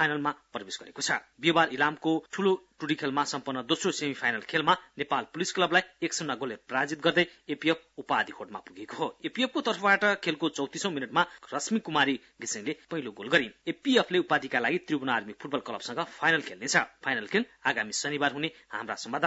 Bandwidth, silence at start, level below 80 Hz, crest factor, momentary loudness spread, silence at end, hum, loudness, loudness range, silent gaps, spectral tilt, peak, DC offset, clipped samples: 8 kHz; 0 s; -74 dBFS; 22 dB; 10 LU; 0 s; none; -29 LUFS; 2 LU; none; -3 dB/octave; -8 dBFS; under 0.1%; under 0.1%